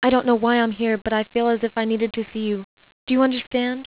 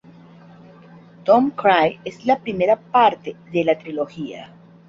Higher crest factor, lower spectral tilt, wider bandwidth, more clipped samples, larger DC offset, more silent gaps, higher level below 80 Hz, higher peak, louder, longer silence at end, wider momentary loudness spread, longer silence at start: second, 14 dB vs 20 dB; first, -9 dB/octave vs -6.5 dB/octave; second, 4 kHz vs 7.4 kHz; neither; first, 0.1% vs under 0.1%; first, 2.64-2.77 s, 2.92-3.07 s, 3.47-3.51 s vs none; first, -54 dBFS vs -62 dBFS; second, -6 dBFS vs -2 dBFS; about the same, -21 LUFS vs -19 LUFS; second, 0.15 s vs 0.45 s; second, 8 LU vs 14 LU; second, 0 s vs 1.25 s